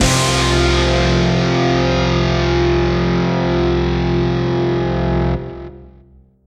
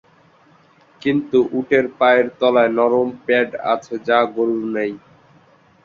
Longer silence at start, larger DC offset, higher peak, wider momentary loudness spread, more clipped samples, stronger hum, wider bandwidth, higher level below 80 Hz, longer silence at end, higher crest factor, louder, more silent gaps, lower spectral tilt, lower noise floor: second, 0 s vs 1.05 s; neither; about the same, 0 dBFS vs -2 dBFS; second, 4 LU vs 8 LU; neither; neither; first, 14 kHz vs 7.2 kHz; first, -24 dBFS vs -62 dBFS; second, 0.55 s vs 0.85 s; about the same, 14 dB vs 16 dB; about the same, -16 LUFS vs -18 LUFS; neither; about the same, -5.5 dB/octave vs -6.5 dB/octave; second, -47 dBFS vs -52 dBFS